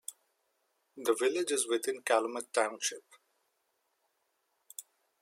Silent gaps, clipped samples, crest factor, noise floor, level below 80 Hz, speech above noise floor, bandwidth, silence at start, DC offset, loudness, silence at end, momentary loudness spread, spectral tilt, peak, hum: none; under 0.1%; 22 dB; -79 dBFS; under -90 dBFS; 47 dB; 16.5 kHz; 0.1 s; under 0.1%; -32 LUFS; 0.4 s; 18 LU; -0.5 dB/octave; -14 dBFS; none